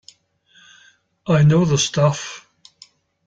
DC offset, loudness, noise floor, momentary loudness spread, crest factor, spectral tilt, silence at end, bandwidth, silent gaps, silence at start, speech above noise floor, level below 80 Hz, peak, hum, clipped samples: under 0.1%; -17 LUFS; -56 dBFS; 19 LU; 16 dB; -5.5 dB/octave; 0.85 s; 9 kHz; none; 1.25 s; 40 dB; -50 dBFS; -4 dBFS; none; under 0.1%